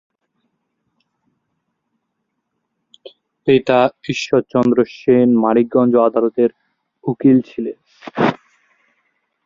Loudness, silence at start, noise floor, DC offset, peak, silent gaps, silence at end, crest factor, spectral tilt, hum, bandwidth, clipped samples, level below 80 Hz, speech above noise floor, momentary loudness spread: -16 LUFS; 3.05 s; -74 dBFS; under 0.1%; 0 dBFS; none; 1.1 s; 18 dB; -7 dB/octave; none; 7.4 kHz; under 0.1%; -60 dBFS; 59 dB; 14 LU